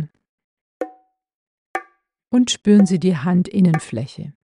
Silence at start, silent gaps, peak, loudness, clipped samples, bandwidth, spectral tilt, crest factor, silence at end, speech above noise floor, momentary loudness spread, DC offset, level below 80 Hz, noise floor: 0 s; 0.29-0.38 s, 0.44-0.80 s, 1.35-1.74 s; -4 dBFS; -17 LUFS; under 0.1%; 11 kHz; -6 dB/octave; 16 dB; 0.3 s; 32 dB; 18 LU; under 0.1%; -60 dBFS; -49 dBFS